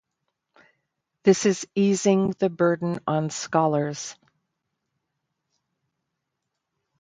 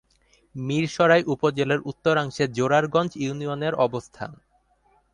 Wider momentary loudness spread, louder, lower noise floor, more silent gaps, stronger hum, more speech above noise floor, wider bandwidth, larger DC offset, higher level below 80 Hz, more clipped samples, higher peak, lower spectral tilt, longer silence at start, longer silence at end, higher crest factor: second, 7 LU vs 15 LU; about the same, -23 LUFS vs -23 LUFS; first, -81 dBFS vs -64 dBFS; neither; neither; first, 59 dB vs 41 dB; second, 9.4 kHz vs 11 kHz; neither; second, -68 dBFS vs -60 dBFS; neither; about the same, -4 dBFS vs -6 dBFS; about the same, -5.5 dB/octave vs -6 dB/octave; first, 1.25 s vs 0.55 s; first, 2.9 s vs 0.8 s; about the same, 22 dB vs 18 dB